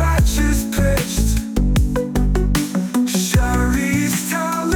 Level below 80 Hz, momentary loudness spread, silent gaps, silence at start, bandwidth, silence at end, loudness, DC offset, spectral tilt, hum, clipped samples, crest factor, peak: -20 dBFS; 3 LU; none; 0 s; 19.5 kHz; 0 s; -18 LUFS; under 0.1%; -5 dB/octave; none; under 0.1%; 12 dB; -4 dBFS